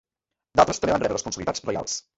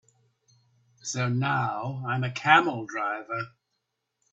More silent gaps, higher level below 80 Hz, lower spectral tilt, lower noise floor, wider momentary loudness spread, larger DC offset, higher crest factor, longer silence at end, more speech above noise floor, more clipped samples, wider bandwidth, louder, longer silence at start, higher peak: neither; first, -50 dBFS vs -68 dBFS; about the same, -3.5 dB/octave vs -4.5 dB/octave; first, -87 dBFS vs -80 dBFS; second, 8 LU vs 14 LU; neither; about the same, 22 dB vs 24 dB; second, 0.15 s vs 0.85 s; first, 63 dB vs 54 dB; neither; about the same, 8.2 kHz vs 8 kHz; about the same, -24 LUFS vs -26 LUFS; second, 0.55 s vs 1.05 s; about the same, -2 dBFS vs -4 dBFS